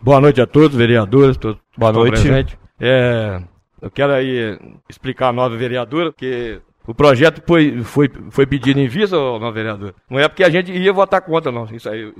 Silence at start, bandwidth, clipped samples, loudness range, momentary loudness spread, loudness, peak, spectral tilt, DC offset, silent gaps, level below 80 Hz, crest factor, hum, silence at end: 0 s; 12.5 kHz; under 0.1%; 5 LU; 15 LU; -15 LUFS; 0 dBFS; -7 dB/octave; under 0.1%; none; -34 dBFS; 14 dB; none; 0.1 s